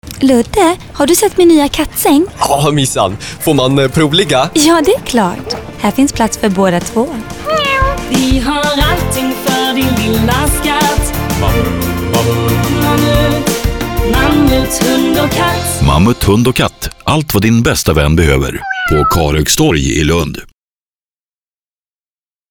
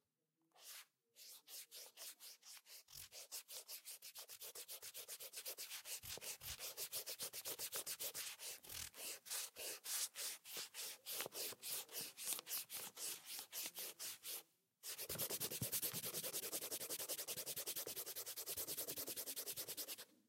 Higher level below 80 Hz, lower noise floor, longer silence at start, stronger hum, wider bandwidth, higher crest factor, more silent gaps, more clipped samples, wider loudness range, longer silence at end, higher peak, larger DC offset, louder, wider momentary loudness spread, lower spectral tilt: first, -24 dBFS vs -82 dBFS; about the same, under -90 dBFS vs -88 dBFS; second, 0.05 s vs 0.55 s; neither; first, over 20 kHz vs 16 kHz; second, 12 dB vs 28 dB; neither; neither; second, 2 LU vs 9 LU; first, 2.05 s vs 0.15 s; first, 0 dBFS vs -22 dBFS; neither; first, -11 LUFS vs -47 LUFS; second, 6 LU vs 12 LU; first, -4.5 dB/octave vs -0.5 dB/octave